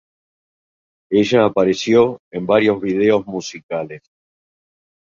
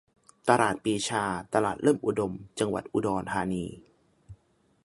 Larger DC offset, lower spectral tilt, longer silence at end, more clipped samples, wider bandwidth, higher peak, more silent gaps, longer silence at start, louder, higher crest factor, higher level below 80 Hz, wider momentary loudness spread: neither; about the same, -5.5 dB/octave vs -5 dB/octave; first, 1.05 s vs 0.5 s; neither; second, 7.6 kHz vs 11.5 kHz; about the same, -2 dBFS vs -4 dBFS; first, 2.19-2.31 s, 3.63-3.69 s vs none; first, 1.1 s vs 0.45 s; first, -17 LUFS vs -28 LUFS; second, 16 dB vs 24 dB; about the same, -56 dBFS vs -58 dBFS; first, 13 LU vs 8 LU